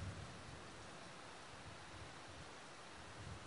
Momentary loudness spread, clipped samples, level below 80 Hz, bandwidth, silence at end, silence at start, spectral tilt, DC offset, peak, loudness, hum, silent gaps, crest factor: 2 LU; under 0.1%; -66 dBFS; 10.5 kHz; 0 s; 0 s; -4 dB/octave; under 0.1%; -38 dBFS; -54 LUFS; none; none; 16 dB